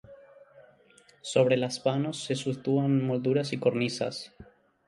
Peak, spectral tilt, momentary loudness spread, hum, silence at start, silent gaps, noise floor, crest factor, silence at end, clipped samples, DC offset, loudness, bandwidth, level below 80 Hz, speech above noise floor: -10 dBFS; -6 dB/octave; 9 LU; none; 0.1 s; none; -60 dBFS; 20 dB; 0.45 s; under 0.1%; under 0.1%; -28 LUFS; 11.5 kHz; -68 dBFS; 32 dB